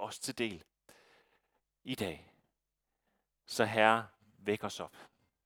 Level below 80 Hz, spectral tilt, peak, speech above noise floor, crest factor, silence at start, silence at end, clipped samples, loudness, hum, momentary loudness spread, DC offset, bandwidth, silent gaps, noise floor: -74 dBFS; -4 dB/octave; -10 dBFS; 53 dB; 28 dB; 0 s; 0.4 s; under 0.1%; -34 LUFS; none; 23 LU; under 0.1%; 19 kHz; none; -87 dBFS